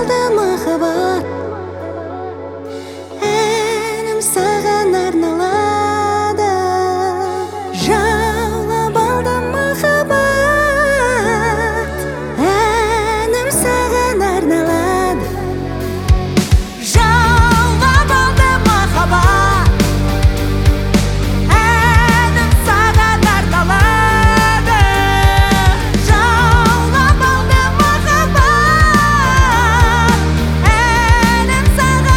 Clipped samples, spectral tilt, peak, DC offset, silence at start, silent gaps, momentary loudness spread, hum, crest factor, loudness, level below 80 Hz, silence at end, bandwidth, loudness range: under 0.1%; -5 dB/octave; 0 dBFS; under 0.1%; 0 s; none; 9 LU; none; 12 dB; -13 LUFS; -20 dBFS; 0 s; 18 kHz; 5 LU